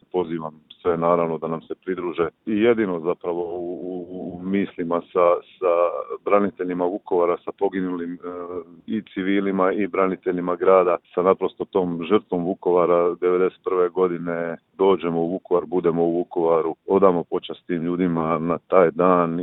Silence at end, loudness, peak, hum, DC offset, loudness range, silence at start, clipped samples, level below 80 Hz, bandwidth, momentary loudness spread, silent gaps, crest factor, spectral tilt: 0 s; -22 LUFS; -2 dBFS; none; under 0.1%; 4 LU; 0.15 s; under 0.1%; -62 dBFS; 4 kHz; 12 LU; none; 20 dB; -11 dB/octave